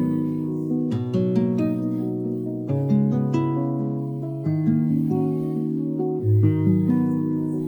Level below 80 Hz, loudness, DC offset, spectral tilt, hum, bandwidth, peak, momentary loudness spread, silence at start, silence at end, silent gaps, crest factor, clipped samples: -62 dBFS; -23 LUFS; under 0.1%; -11 dB/octave; none; 19 kHz; -8 dBFS; 7 LU; 0 s; 0 s; none; 14 dB; under 0.1%